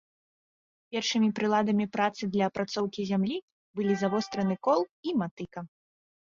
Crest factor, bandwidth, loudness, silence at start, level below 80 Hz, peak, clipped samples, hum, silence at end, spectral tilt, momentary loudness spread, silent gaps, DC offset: 18 dB; 7.4 kHz; -29 LUFS; 0.9 s; -70 dBFS; -12 dBFS; under 0.1%; none; 0.6 s; -5.5 dB/octave; 12 LU; 3.42-3.74 s, 4.91-5.03 s, 5.31-5.37 s; under 0.1%